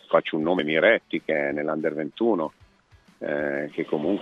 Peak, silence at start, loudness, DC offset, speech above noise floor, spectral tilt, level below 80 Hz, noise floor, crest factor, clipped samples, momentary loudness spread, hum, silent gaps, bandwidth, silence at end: -4 dBFS; 0.1 s; -25 LUFS; under 0.1%; 33 dB; -7.5 dB/octave; -64 dBFS; -57 dBFS; 20 dB; under 0.1%; 9 LU; none; none; 6.4 kHz; 0 s